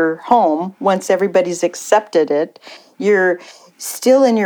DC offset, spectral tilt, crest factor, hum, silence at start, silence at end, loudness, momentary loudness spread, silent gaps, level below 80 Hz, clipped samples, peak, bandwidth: under 0.1%; -4.5 dB/octave; 16 dB; none; 0 s; 0 s; -16 LUFS; 9 LU; none; -64 dBFS; under 0.1%; 0 dBFS; 19.5 kHz